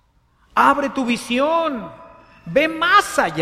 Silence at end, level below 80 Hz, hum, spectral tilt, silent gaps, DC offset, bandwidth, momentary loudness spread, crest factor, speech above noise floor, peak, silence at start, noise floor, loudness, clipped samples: 0 s; -52 dBFS; none; -3.5 dB/octave; none; under 0.1%; 15.5 kHz; 10 LU; 18 dB; 41 dB; -2 dBFS; 0.55 s; -58 dBFS; -18 LUFS; under 0.1%